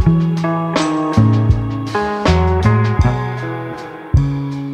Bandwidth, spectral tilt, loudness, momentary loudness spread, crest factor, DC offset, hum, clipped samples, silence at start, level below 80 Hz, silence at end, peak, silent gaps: 8.8 kHz; -7.5 dB/octave; -16 LUFS; 10 LU; 14 dB; under 0.1%; none; under 0.1%; 0 s; -26 dBFS; 0 s; -2 dBFS; none